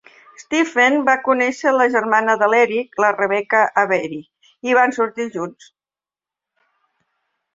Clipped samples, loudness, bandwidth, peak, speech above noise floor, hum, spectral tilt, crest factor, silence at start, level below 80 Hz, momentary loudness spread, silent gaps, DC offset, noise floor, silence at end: under 0.1%; -17 LUFS; 7.8 kHz; -2 dBFS; over 73 dB; none; -4 dB/octave; 18 dB; 0.4 s; -68 dBFS; 11 LU; none; under 0.1%; under -90 dBFS; 2.05 s